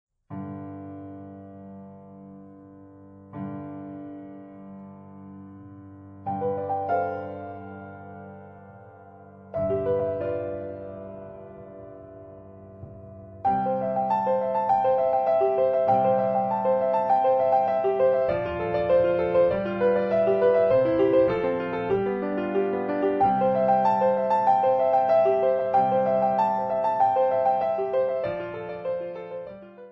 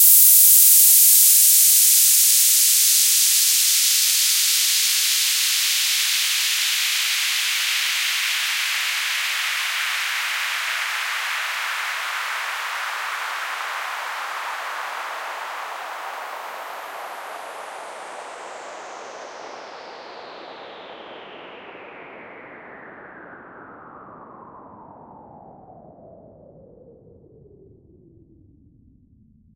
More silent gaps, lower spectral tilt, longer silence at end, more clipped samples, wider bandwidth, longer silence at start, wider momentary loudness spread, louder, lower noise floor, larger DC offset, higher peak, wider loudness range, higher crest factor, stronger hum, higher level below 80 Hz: neither; first, -9 dB/octave vs 3.5 dB/octave; second, 0 s vs 3.85 s; neither; second, 5.8 kHz vs 16.5 kHz; first, 0.3 s vs 0 s; second, 23 LU vs 26 LU; second, -24 LUFS vs -15 LUFS; second, -48 dBFS vs -55 dBFS; neither; second, -10 dBFS vs 0 dBFS; second, 19 LU vs 26 LU; second, 16 dB vs 22 dB; neither; first, -58 dBFS vs -70 dBFS